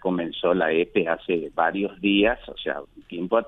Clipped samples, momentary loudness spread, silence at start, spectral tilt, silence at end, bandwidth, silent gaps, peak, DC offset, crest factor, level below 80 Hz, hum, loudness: under 0.1%; 10 LU; 0.05 s; -8 dB/octave; 0 s; 4 kHz; none; -6 dBFS; under 0.1%; 18 dB; -52 dBFS; none; -24 LUFS